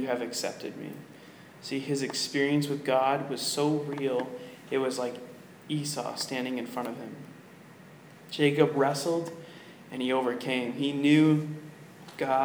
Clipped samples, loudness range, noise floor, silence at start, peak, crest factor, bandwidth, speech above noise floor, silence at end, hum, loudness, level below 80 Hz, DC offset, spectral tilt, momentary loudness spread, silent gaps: under 0.1%; 6 LU; -51 dBFS; 0 s; -8 dBFS; 22 dB; over 20 kHz; 22 dB; 0 s; none; -29 LUFS; -82 dBFS; under 0.1%; -5 dB/octave; 21 LU; none